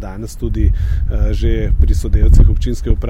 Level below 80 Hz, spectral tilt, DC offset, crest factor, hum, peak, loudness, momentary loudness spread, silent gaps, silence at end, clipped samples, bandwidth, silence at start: -12 dBFS; -7.5 dB/octave; under 0.1%; 10 dB; none; -2 dBFS; -16 LUFS; 9 LU; none; 0 s; under 0.1%; 10.5 kHz; 0 s